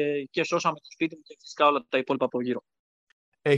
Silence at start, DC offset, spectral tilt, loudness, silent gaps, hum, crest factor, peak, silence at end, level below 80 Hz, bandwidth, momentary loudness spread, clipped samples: 0 s; under 0.1%; -5 dB/octave; -27 LUFS; 2.79-3.32 s; none; 22 dB; -6 dBFS; 0 s; -78 dBFS; 9 kHz; 10 LU; under 0.1%